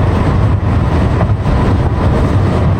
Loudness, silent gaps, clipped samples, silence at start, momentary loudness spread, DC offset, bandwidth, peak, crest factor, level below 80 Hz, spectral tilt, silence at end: -13 LUFS; none; under 0.1%; 0 s; 1 LU; under 0.1%; 9.4 kHz; -2 dBFS; 8 dB; -18 dBFS; -8.5 dB/octave; 0 s